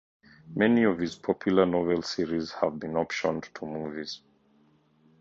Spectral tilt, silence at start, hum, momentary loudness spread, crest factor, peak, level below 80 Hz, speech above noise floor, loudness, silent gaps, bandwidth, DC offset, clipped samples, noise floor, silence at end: -6 dB/octave; 0.45 s; none; 14 LU; 20 dB; -8 dBFS; -60 dBFS; 36 dB; -28 LUFS; none; 7.8 kHz; under 0.1%; under 0.1%; -64 dBFS; 1.05 s